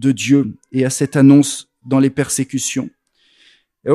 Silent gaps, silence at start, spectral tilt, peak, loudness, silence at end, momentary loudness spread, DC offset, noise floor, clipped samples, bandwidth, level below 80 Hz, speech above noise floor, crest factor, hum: none; 0 s; -5.5 dB/octave; 0 dBFS; -15 LUFS; 0 s; 15 LU; under 0.1%; -56 dBFS; under 0.1%; 13 kHz; -58 dBFS; 41 dB; 16 dB; none